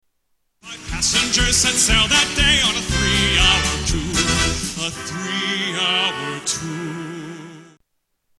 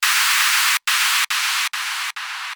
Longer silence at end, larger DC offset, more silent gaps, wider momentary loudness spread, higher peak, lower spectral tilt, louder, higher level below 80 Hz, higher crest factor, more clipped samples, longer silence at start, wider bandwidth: first, 0.75 s vs 0 s; neither; neither; first, 16 LU vs 10 LU; about the same, -2 dBFS vs -4 dBFS; first, -2 dB/octave vs 7.5 dB/octave; about the same, -17 LUFS vs -17 LUFS; first, -30 dBFS vs -88 dBFS; about the same, 18 dB vs 16 dB; neither; first, 0.65 s vs 0 s; second, 13.5 kHz vs over 20 kHz